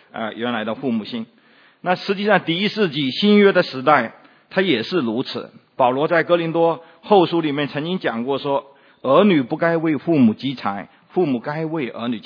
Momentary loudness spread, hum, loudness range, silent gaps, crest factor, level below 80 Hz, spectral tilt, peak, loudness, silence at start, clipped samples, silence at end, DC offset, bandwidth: 12 LU; none; 2 LU; none; 20 dB; -72 dBFS; -7.5 dB/octave; 0 dBFS; -19 LUFS; 0.15 s; under 0.1%; 0.05 s; under 0.1%; 5.4 kHz